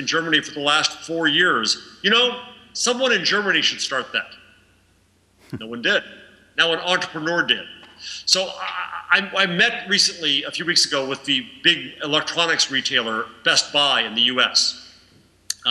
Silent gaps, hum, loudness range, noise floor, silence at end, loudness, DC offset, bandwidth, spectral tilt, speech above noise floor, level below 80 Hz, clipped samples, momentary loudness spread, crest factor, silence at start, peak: none; none; 5 LU; -59 dBFS; 0 s; -19 LUFS; under 0.1%; 14 kHz; -1.5 dB/octave; 39 dB; -66 dBFS; under 0.1%; 11 LU; 20 dB; 0 s; -2 dBFS